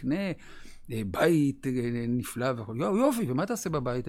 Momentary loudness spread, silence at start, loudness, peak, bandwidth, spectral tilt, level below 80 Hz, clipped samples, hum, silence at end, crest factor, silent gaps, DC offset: 10 LU; 0 s; -29 LUFS; -12 dBFS; 17 kHz; -6.5 dB/octave; -52 dBFS; under 0.1%; none; 0 s; 16 dB; none; under 0.1%